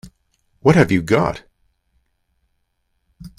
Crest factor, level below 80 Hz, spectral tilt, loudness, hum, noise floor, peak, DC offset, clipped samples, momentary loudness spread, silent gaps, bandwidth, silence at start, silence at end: 22 dB; -46 dBFS; -7 dB/octave; -16 LUFS; none; -69 dBFS; 0 dBFS; under 0.1%; under 0.1%; 10 LU; none; 13 kHz; 0.05 s; 0.1 s